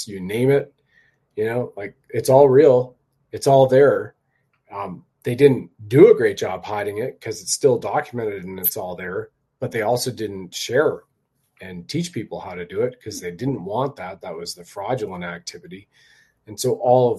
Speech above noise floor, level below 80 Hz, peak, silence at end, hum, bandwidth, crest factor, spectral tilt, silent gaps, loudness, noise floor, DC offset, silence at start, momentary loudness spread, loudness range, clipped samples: 48 dB; -62 dBFS; 0 dBFS; 0 s; none; 13.5 kHz; 20 dB; -5.5 dB/octave; none; -20 LUFS; -68 dBFS; under 0.1%; 0 s; 19 LU; 11 LU; under 0.1%